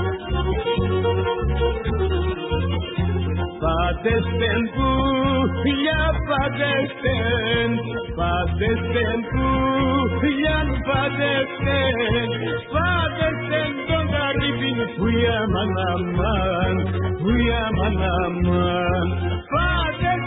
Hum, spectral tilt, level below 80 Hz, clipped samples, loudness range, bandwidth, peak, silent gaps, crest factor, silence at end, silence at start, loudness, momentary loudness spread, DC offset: none; -11.5 dB/octave; -28 dBFS; under 0.1%; 2 LU; 4 kHz; -8 dBFS; none; 14 dB; 0 s; 0 s; -21 LUFS; 4 LU; under 0.1%